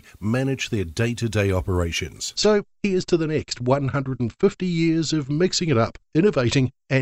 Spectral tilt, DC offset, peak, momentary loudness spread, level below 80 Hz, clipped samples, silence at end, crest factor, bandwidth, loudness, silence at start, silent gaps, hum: -5.5 dB/octave; under 0.1%; -6 dBFS; 6 LU; -44 dBFS; under 0.1%; 0 s; 16 dB; 15.5 kHz; -22 LUFS; 0.2 s; none; none